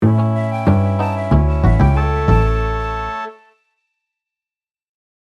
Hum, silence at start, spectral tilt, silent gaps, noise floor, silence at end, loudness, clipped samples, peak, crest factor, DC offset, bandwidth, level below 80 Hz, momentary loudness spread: none; 0 s; -9 dB/octave; none; under -90 dBFS; 1.9 s; -16 LUFS; under 0.1%; 0 dBFS; 16 dB; under 0.1%; 7.4 kHz; -22 dBFS; 9 LU